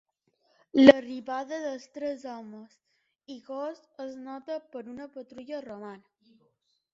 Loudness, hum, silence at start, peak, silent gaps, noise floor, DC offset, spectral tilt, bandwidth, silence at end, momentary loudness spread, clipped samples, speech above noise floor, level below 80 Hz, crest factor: -26 LUFS; none; 0.75 s; 0 dBFS; none; -73 dBFS; under 0.1%; -3 dB/octave; 7.6 kHz; 0.95 s; 26 LU; under 0.1%; 46 dB; -70 dBFS; 30 dB